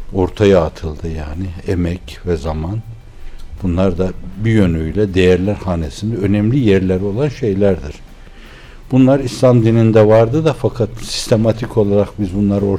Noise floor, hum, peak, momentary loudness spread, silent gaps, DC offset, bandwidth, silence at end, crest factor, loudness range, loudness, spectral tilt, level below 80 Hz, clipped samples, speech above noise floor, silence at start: -36 dBFS; none; -2 dBFS; 13 LU; none; under 0.1%; 13 kHz; 0 s; 12 dB; 7 LU; -15 LUFS; -7.5 dB/octave; -32 dBFS; under 0.1%; 22 dB; 0 s